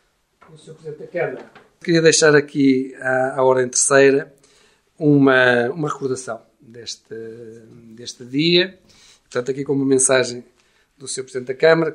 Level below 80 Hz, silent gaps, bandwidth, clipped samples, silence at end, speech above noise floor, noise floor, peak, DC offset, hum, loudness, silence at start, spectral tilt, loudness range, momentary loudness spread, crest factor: -66 dBFS; none; 11.5 kHz; under 0.1%; 0 s; 38 dB; -56 dBFS; -2 dBFS; under 0.1%; none; -17 LUFS; 0.65 s; -3.5 dB/octave; 7 LU; 22 LU; 18 dB